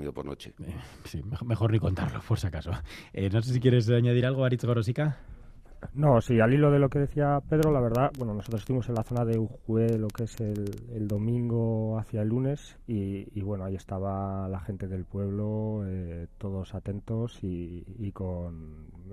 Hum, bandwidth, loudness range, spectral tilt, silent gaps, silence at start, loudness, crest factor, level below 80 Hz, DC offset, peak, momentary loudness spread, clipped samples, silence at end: none; 14 kHz; 9 LU; -8 dB/octave; none; 0 s; -29 LUFS; 20 dB; -48 dBFS; under 0.1%; -10 dBFS; 15 LU; under 0.1%; 0 s